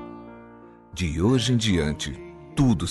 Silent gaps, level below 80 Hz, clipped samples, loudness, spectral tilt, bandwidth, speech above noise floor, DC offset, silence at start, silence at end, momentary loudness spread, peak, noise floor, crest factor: none; -40 dBFS; under 0.1%; -24 LUFS; -5.5 dB/octave; 11.5 kHz; 25 dB; under 0.1%; 0 s; 0 s; 19 LU; -8 dBFS; -47 dBFS; 16 dB